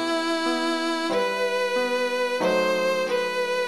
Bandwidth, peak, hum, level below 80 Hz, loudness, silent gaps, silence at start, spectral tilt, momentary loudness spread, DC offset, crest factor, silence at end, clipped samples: 14 kHz; -12 dBFS; none; -68 dBFS; -24 LUFS; none; 0 s; -3.5 dB/octave; 2 LU; under 0.1%; 12 dB; 0 s; under 0.1%